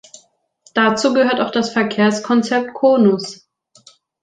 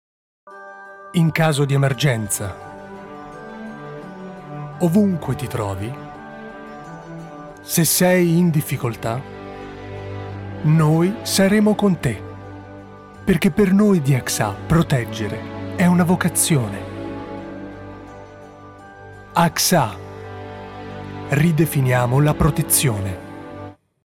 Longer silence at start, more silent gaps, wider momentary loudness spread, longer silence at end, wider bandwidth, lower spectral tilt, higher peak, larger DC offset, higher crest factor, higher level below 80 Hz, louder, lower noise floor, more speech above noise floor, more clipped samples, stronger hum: first, 0.75 s vs 0.45 s; neither; second, 7 LU vs 21 LU; first, 0.85 s vs 0.3 s; second, 9.4 kHz vs 17.5 kHz; about the same, -5 dB/octave vs -5 dB/octave; first, 0 dBFS vs -4 dBFS; neither; about the same, 16 dB vs 16 dB; second, -62 dBFS vs -44 dBFS; about the same, -16 LUFS vs -18 LUFS; first, -54 dBFS vs -40 dBFS; first, 39 dB vs 23 dB; neither; neither